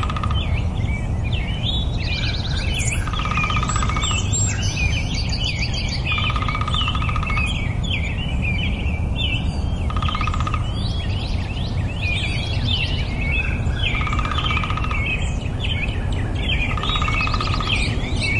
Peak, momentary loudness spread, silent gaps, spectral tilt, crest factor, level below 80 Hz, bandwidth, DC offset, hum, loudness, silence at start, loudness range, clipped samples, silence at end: -6 dBFS; 4 LU; none; -4 dB/octave; 16 dB; -26 dBFS; 11.5 kHz; under 0.1%; none; -22 LUFS; 0 s; 2 LU; under 0.1%; 0 s